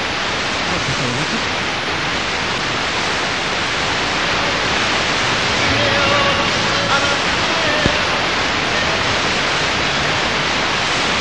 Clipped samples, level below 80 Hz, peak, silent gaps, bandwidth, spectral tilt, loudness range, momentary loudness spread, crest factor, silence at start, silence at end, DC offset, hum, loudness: under 0.1%; -38 dBFS; 0 dBFS; none; 11 kHz; -3 dB/octave; 3 LU; 4 LU; 18 dB; 0 s; 0 s; 1%; none; -16 LUFS